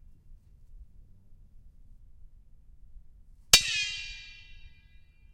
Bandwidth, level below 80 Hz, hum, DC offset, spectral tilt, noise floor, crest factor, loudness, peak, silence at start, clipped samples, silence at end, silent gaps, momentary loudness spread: 16 kHz; -50 dBFS; none; under 0.1%; 1 dB/octave; -55 dBFS; 34 dB; -23 LUFS; -2 dBFS; 0.3 s; under 0.1%; 0.65 s; none; 28 LU